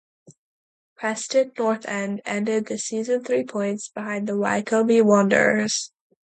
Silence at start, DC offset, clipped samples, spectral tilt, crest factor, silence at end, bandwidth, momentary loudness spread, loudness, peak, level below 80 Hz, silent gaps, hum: 0.3 s; under 0.1%; under 0.1%; -4.5 dB/octave; 20 dB; 0.45 s; 9.2 kHz; 11 LU; -22 LUFS; -4 dBFS; -72 dBFS; 0.38-0.96 s; none